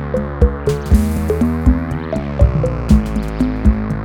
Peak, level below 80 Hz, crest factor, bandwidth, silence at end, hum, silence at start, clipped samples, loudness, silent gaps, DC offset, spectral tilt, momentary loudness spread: 0 dBFS; -18 dBFS; 14 dB; 15.5 kHz; 0 s; none; 0 s; under 0.1%; -17 LUFS; none; under 0.1%; -8.5 dB/octave; 6 LU